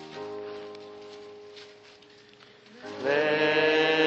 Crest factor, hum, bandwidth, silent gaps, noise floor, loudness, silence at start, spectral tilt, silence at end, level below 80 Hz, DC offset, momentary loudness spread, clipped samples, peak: 18 dB; none; 7.6 kHz; none; -54 dBFS; -25 LUFS; 0 s; -4.5 dB/octave; 0 s; -78 dBFS; under 0.1%; 24 LU; under 0.1%; -10 dBFS